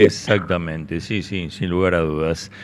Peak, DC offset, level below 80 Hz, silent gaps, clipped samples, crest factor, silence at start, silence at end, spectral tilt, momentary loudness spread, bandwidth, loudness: 0 dBFS; under 0.1%; -42 dBFS; none; under 0.1%; 20 dB; 0 s; 0 s; -6 dB/octave; 8 LU; 12 kHz; -21 LUFS